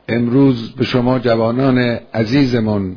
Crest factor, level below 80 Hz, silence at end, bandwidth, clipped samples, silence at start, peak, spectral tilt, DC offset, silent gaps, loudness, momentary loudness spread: 14 dB; -44 dBFS; 0 s; 5.4 kHz; under 0.1%; 0.1 s; 0 dBFS; -8 dB/octave; under 0.1%; none; -15 LUFS; 5 LU